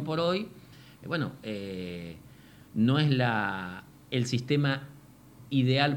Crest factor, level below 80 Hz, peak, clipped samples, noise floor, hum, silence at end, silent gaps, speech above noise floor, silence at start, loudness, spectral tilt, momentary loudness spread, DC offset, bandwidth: 22 dB; -64 dBFS; -8 dBFS; under 0.1%; -52 dBFS; none; 0 s; none; 24 dB; 0 s; -29 LUFS; -6.5 dB/octave; 18 LU; under 0.1%; 16.5 kHz